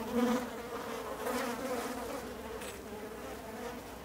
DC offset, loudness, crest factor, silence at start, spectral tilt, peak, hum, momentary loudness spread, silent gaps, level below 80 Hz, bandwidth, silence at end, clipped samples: under 0.1%; -38 LUFS; 18 dB; 0 s; -4 dB/octave; -20 dBFS; none; 11 LU; none; -58 dBFS; 16 kHz; 0 s; under 0.1%